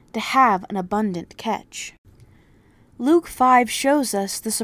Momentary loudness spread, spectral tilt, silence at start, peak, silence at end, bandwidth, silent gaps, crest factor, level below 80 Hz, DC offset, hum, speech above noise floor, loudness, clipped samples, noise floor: 13 LU; -3.5 dB/octave; 0.15 s; -4 dBFS; 0 s; 16 kHz; 1.98-2.04 s; 18 dB; -56 dBFS; under 0.1%; none; 34 dB; -20 LUFS; under 0.1%; -54 dBFS